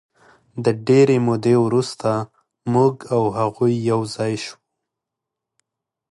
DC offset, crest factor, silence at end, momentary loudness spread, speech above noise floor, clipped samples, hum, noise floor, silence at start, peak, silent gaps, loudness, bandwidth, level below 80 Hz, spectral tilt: under 0.1%; 16 dB; 1.6 s; 13 LU; 66 dB; under 0.1%; none; -84 dBFS; 0.55 s; -4 dBFS; none; -19 LUFS; 11.5 kHz; -60 dBFS; -7 dB/octave